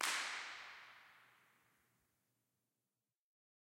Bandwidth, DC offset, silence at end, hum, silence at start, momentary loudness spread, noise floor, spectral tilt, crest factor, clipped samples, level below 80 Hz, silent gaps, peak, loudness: 16 kHz; under 0.1%; 2.5 s; none; 0 s; 22 LU; under -90 dBFS; 2 dB/octave; 28 dB; under 0.1%; under -90 dBFS; none; -22 dBFS; -44 LUFS